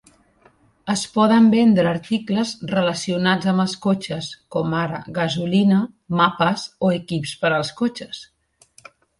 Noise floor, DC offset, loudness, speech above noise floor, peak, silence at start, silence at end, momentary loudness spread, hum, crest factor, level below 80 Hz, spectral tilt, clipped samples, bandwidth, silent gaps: -56 dBFS; under 0.1%; -20 LUFS; 37 dB; -2 dBFS; 0.85 s; 0.95 s; 11 LU; none; 18 dB; -58 dBFS; -5.5 dB/octave; under 0.1%; 11.5 kHz; none